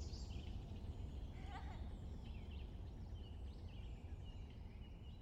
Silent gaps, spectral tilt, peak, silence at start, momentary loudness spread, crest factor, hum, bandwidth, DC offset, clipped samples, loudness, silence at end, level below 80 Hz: none; -6.5 dB/octave; -38 dBFS; 0 s; 4 LU; 12 dB; none; 8.8 kHz; under 0.1%; under 0.1%; -53 LUFS; 0 s; -52 dBFS